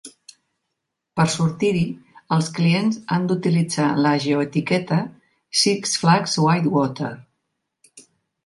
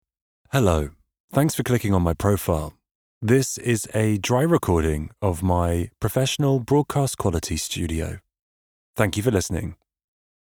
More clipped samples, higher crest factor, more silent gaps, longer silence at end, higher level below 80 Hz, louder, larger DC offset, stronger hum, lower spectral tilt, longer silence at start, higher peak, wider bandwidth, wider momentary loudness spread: neither; about the same, 20 dB vs 20 dB; second, none vs 1.20-1.28 s, 2.91-3.21 s, 8.42-8.94 s; second, 0.45 s vs 0.7 s; second, -58 dBFS vs -38 dBFS; first, -20 LUFS vs -23 LUFS; neither; neither; about the same, -5 dB/octave vs -5.5 dB/octave; second, 0.05 s vs 0.55 s; about the same, -2 dBFS vs -4 dBFS; second, 11.5 kHz vs over 20 kHz; about the same, 9 LU vs 8 LU